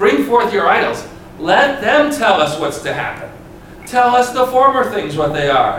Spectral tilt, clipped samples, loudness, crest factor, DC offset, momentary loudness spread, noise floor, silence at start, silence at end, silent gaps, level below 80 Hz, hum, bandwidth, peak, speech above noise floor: -4.5 dB/octave; under 0.1%; -14 LUFS; 14 dB; under 0.1%; 12 LU; -35 dBFS; 0 s; 0 s; none; -44 dBFS; none; 18 kHz; 0 dBFS; 21 dB